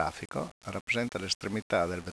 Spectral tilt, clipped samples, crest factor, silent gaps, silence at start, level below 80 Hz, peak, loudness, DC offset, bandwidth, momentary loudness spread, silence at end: -4 dB/octave; under 0.1%; 20 dB; 0.51-0.61 s, 0.81-0.87 s, 1.35-1.40 s, 1.62-1.70 s; 0 s; -58 dBFS; -14 dBFS; -32 LUFS; under 0.1%; 11 kHz; 8 LU; 0 s